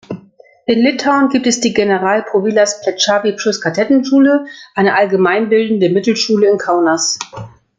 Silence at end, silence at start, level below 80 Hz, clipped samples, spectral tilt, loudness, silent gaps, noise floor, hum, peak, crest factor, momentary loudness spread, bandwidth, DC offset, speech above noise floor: 0.3 s; 0.1 s; -58 dBFS; under 0.1%; -4 dB/octave; -13 LUFS; none; -44 dBFS; none; 0 dBFS; 14 dB; 5 LU; 9.4 kHz; under 0.1%; 31 dB